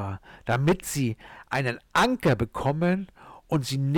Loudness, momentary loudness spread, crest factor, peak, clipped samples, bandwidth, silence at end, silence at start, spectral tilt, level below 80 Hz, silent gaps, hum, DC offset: -26 LUFS; 11 LU; 12 dB; -14 dBFS; under 0.1%; 18 kHz; 0 s; 0 s; -5.5 dB/octave; -50 dBFS; none; none; under 0.1%